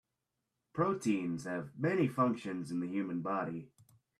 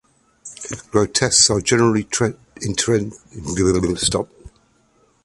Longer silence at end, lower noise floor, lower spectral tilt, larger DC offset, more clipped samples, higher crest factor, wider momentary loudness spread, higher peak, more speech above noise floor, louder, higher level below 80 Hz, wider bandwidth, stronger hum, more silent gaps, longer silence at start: second, 0.5 s vs 0.75 s; first, -87 dBFS vs -59 dBFS; first, -7 dB/octave vs -3.5 dB/octave; neither; neither; about the same, 18 dB vs 20 dB; second, 9 LU vs 18 LU; second, -18 dBFS vs 0 dBFS; first, 52 dB vs 40 dB; second, -35 LUFS vs -18 LUFS; second, -76 dBFS vs -42 dBFS; first, 13.5 kHz vs 11.5 kHz; neither; neither; first, 0.75 s vs 0.45 s